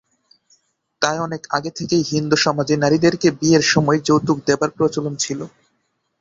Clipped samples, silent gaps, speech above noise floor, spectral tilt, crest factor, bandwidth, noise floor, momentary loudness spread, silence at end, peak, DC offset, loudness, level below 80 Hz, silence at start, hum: under 0.1%; none; 52 dB; -4.5 dB/octave; 18 dB; 7.8 kHz; -69 dBFS; 8 LU; 0.75 s; -2 dBFS; under 0.1%; -18 LUFS; -54 dBFS; 1 s; none